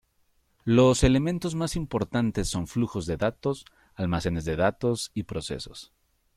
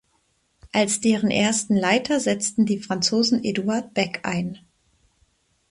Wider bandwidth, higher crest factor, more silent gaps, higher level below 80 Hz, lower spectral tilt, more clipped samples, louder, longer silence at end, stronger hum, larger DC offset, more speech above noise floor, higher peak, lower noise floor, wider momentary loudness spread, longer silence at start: first, 14.5 kHz vs 11.5 kHz; about the same, 18 dB vs 18 dB; neither; first, -42 dBFS vs -60 dBFS; first, -6 dB/octave vs -4 dB/octave; neither; second, -27 LUFS vs -22 LUFS; second, 0.55 s vs 1.15 s; neither; neither; about the same, 42 dB vs 45 dB; second, -8 dBFS vs -4 dBFS; about the same, -68 dBFS vs -67 dBFS; first, 14 LU vs 7 LU; about the same, 0.65 s vs 0.65 s